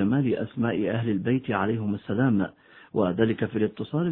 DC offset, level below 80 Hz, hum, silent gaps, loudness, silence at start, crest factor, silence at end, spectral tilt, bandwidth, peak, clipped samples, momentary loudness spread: under 0.1%; -60 dBFS; none; none; -26 LUFS; 0 s; 16 dB; 0 s; -12 dB/octave; 4.1 kHz; -8 dBFS; under 0.1%; 5 LU